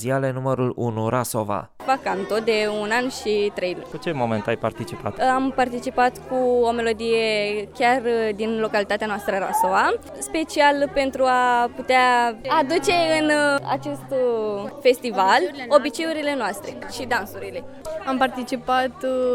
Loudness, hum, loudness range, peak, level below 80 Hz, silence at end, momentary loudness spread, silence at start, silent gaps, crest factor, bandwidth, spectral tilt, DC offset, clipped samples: -22 LUFS; none; 4 LU; -2 dBFS; -52 dBFS; 0 s; 9 LU; 0 s; none; 20 dB; 17.5 kHz; -4.5 dB/octave; under 0.1%; under 0.1%